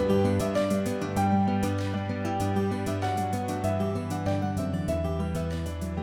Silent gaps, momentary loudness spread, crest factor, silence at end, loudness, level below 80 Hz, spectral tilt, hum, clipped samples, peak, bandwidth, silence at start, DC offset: none; 6 LU; 14 dB; 0 s; -28 LUFS; -44 dBFS; -7 dB/octave; none; under 0.1%; -14 dBFS; 17.5 kHz; 0 s; under 0.1%